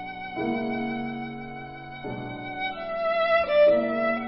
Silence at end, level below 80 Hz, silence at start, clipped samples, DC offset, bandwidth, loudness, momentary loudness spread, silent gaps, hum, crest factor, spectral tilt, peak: 0 s; -56 dBFS; 0 s; under 0.1%; under 0.1%; 5.8 kHz; -26 LUFS; 18 LU; none; none; 16 dB; -9.5 dB/octave; -10 dBFS